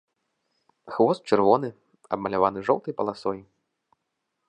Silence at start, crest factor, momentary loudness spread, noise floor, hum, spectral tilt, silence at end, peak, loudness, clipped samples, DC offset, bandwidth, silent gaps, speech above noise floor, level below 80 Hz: 0.85 s; 22 dB; 14 LU; -80 dBFS; none; -7 dB/octave; 1.05 s; -4 dBFS; -24 LUFS; under 0.1%; under 0.1%; 10 kHz; none; 56 dB; -64 dBFS